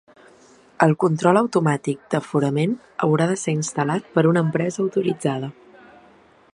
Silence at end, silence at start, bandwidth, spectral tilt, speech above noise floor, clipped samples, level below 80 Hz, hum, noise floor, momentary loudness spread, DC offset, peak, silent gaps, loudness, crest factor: 1.05 s; 0.8 s; 11 kHz; -6.5 dB/octave; 32 dB; under 0.1%; -66 dBFS; none; -52 dBFS; 7 LU; under 0.1%; 0 dBFS; none; -21 LUFS; 20 dB